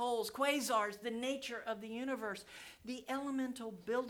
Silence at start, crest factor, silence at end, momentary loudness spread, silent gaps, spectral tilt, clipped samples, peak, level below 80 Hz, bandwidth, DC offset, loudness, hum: 0 s; 18 dB; 0 s; 12 LU; none; -3 dB/octave; under 0.1%; -20 dBFS; -76 dBFS; 19.5 kHz; under 0.1%; -39 LUFS; none